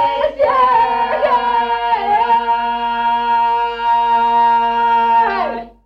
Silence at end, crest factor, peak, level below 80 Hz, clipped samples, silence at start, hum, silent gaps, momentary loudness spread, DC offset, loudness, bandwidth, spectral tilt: 0.15 s; 10 dB; -4 dBFS; -46 dBFS; under 0.1%; 0 s; none; none; 5 LU; under 0.1%; -14 LUFS; 6 kHz; -4.5 dB/octave